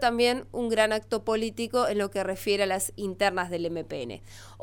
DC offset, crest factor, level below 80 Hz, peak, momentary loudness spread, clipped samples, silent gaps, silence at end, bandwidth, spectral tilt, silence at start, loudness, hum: under 0.1%; 18 dB; -54 dBFS; -10 dBFS; 11 LU; under 0.1%; none; 0 s; 18 kHz; -3.5 dB/octave; 0 s; -28 LUFS; none